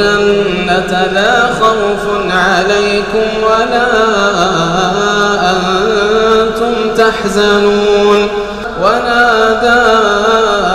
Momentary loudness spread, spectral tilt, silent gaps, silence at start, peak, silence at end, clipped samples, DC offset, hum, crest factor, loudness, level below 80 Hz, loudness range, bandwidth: 4 LU; -4 dB/octave; none; 0 s; 0 dBFS; 0 s; under 0.1%; under 0.1%; none; 10 dB; -10 LUFS; -34 dBFS; 1 LU; 14 kHz